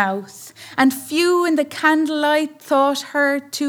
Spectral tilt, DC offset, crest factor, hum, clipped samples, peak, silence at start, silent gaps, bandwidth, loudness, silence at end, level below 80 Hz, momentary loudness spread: -3.5 dB/octave; under 0.1%; 16 dB; none; under 0.1%; -4 dBFS; 0 s; none; over 20 kHz; -18 LUFS; 0 s; -74 dBFS; 10 LU